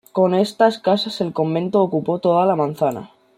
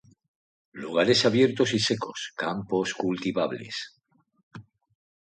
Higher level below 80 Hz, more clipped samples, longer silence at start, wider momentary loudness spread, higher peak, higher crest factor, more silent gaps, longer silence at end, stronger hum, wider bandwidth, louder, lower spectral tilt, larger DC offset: about the same, -64 dBFS vs -66 dBFS; neither; second, 0.15 s vs 0.75 s; second, 6 LU vs 14 LU; first, -2 dBFS vs -8 dBFS; about the same, 16 dB vs 20 dB; second, none vs 4.43-4.51 s; second, 0.3 s vs 0.6 s; neither; first, 15 kHz vs 9.4 kHz; first, -19 LUFS vs -26 LUFS; first, -6.5 dB/octave vs -4.5 dB/octave; neither